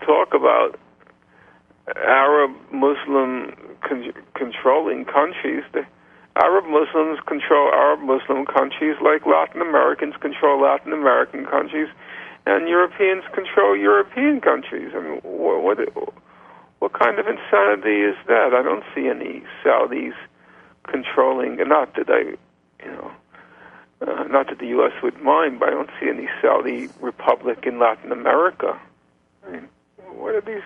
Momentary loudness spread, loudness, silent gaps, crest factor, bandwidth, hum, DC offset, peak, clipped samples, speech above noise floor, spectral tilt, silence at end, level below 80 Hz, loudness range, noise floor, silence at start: 14 LU; -19 LUFS; none; 20 dB; 4.7 kHz; none; under 0.1%; 0 dBFS; under 0.1%; 41 dB; -6.5 dB/octave; 0 s; -66 dBFS; 4 LU; -61 dBFS; 0 s